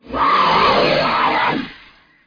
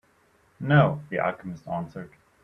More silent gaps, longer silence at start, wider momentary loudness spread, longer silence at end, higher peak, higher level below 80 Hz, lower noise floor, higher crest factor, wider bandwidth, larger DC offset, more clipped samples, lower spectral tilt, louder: neither; second, 0.05 s vs 0.6 s; second, 9 LU vs 19 LU; first, 0.5 s vs 0.35 s; about the same, -4 dBFS vs -6 dBFS; first, -44 dBFS vs -58 dBFS; second, -47 dBFS vs -63 dBFS; second, 14 dB vs 20 dB; second, 5.2 kHz vs 5.8 kHz; neither; neither; second, -5 dB/octave vs -9 dB/octave; first, -15 LUFS vs -25 LUFS